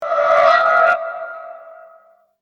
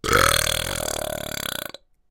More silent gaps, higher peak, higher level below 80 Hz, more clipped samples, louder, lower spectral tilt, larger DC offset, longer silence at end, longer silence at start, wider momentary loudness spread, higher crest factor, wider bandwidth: neither; about the same, 0 dBFS vs 0 dBFS; second, -62 dBFS vs -38 dBFS; neither; first, -14 LUFS vs -22 LUFS; about the same, -2 dB/octave vs -2 dB/octave; neither; first, 0.65 s vs 0.4 s; about the same, 0 s vs 0.05 s; first, 21 LU vs 13 LU; second, 16 dB vs 24 dB; second, 7.2 kHz vs 17 kHz